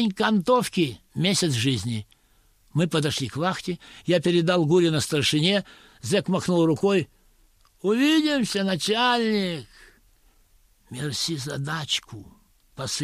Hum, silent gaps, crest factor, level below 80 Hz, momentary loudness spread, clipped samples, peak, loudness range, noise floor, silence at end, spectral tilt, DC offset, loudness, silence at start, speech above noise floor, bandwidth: none; none; 16 dB; -58 dBFS; 12 LU; under 0.1%; -8 dBFS; 5 LU; -61 dBFS; 0 s; -4.5 dB/octave; under 0.1%; -23 LUFS; 0 s; 38 dB; 15 kHz